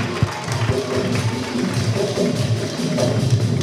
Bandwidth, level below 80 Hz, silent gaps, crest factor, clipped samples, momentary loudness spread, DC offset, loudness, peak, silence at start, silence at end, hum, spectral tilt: 14.5 kHz; -42 dBFS; none; 14 dB; under 0.1%; 4 LU; under 0.1%; -21 LUFS; -4 dBFS; 0 s; 0 s; none; -6 dB/octave